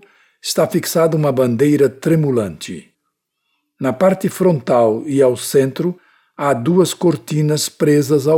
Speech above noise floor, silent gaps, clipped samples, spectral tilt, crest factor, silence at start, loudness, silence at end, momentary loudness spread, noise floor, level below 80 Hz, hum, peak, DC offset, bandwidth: 58 dB; none; under 0.1%; -6 dB/octave; 14 dB; 0.45 s; -16 LUFS; 0 s; 9 LU; -73 dBFS; -58 dBFS; none; -2 dBFS; under 0.1%; 17.5 kHz